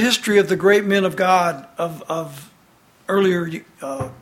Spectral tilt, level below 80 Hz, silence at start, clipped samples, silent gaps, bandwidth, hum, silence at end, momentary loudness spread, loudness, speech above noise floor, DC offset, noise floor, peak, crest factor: -4.5 dB/octave; -58 dBFS; 0 s; under 0.1%; none; 16 kHz; none; 0.05 s; 15 LU; -19 LUFS; 35 dB; under 0.1%; -54 dBFS; -2 dBFS; 18 dB